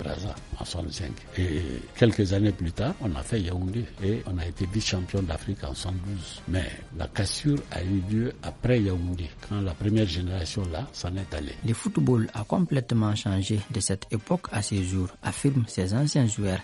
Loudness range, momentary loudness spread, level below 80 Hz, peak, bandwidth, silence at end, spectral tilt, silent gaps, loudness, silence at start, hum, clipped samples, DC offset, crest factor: 3 LU; 9 LU; -42 dBFS; -6 dBFS; 11.5 kHz; 0 s; -6 dB/octave; none; -28 LUFS; 0 s; none; under 0.1%; under 0.1%; 20 dB